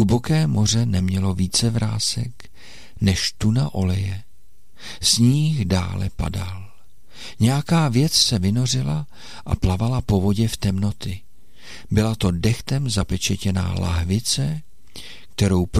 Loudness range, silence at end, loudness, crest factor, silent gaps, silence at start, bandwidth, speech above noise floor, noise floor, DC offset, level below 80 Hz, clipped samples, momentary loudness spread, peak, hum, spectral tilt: 3 LU; 0 s; -21 LUFS; 16 dB; none; 0 s; 15 kHz; 37 dB; -57 dBFS; 2%; -38 dBFS; under 0.1%; 16 LU; -4 dBFS; none; -5 dB/octave